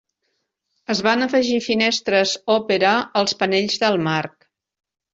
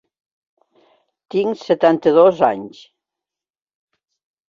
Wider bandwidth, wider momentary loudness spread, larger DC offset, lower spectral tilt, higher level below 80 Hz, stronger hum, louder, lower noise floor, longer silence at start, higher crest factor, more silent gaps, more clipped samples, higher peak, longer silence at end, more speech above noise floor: first, 8 kHz vs 7.2 kHz; second, 6 LU vs 14 LU; neither; second, -4 dB/octave vs -7 dB/octave; about the same, -62 dBFS vs -64 dBFS; neither; second, -19 LUFS vs -16 LUFS; second, -73 dBFS vs -87 dBFS; second, 0.9 s vs 1.35 s; about the same, 18 dB vs 18 dB; neither; neither; about the same, -2 dBFS vs -2 dBFS; second, 0.85 s vs 1.8 s; second, 54 dB vs 72 dB